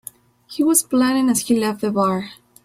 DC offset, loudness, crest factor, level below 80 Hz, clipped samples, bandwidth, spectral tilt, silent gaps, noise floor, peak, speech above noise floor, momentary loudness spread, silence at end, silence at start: under 0.1%; -18 LUFS; 18 dB; -60 dBFS; under 0.1%; 16.5 kHz; -4 dB/octave; none; -41 dBFS; -2 dBFS; 23 dB; 17 LU; 0.3 s; 0.5 s